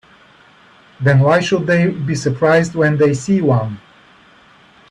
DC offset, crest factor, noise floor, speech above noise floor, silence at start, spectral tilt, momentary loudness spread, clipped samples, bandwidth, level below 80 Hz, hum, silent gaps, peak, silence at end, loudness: under 0.1%; 16 dB; -47 dBFS; 33 dB; 1 s; -6.5 dB/octave; 7 LU; under 0.1%; 10.5 kHz; -52 dBFS; none; none; 0 dBFS; 1.1 s; -15 LUFS